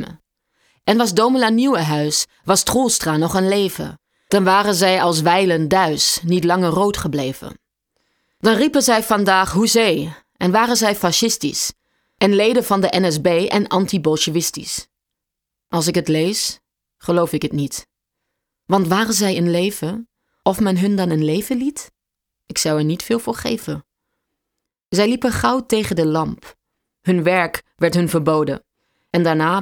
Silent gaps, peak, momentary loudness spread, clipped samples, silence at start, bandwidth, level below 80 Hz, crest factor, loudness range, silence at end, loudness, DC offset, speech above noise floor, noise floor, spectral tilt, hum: none; -2 dBFS; 10 LU; under 0.1%; 0 s; over 20 kHz; -48 dBFS; 16 dB; 5 LU; 0 s; -17 LUFS; under 0.1%; 65 dB; -82 dBFS; -4 dB/octave; none